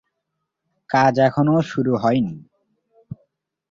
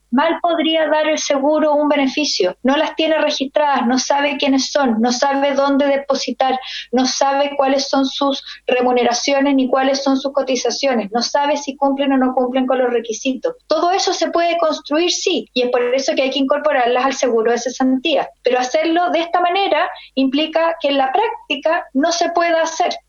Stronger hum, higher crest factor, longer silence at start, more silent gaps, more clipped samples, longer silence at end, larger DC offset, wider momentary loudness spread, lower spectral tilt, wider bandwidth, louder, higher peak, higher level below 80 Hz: neither; about the same, 18 dB vs 16 dB; first, 0.9 s vs 0.1 s; neither; neither; first, 0.55 s vs 0.1 s; neither; first, 24 LU vs 4 LU; first, -7.5 dB/octave vs -2.5 dB/octave; about the same, 7.6 kHz vs 7.6 kHz; about the same, -19 LUFS vs -17 LUFS; second, -4 dBFS vs 0 dBFS; about the same, -58 dBFS vs -58 dBFS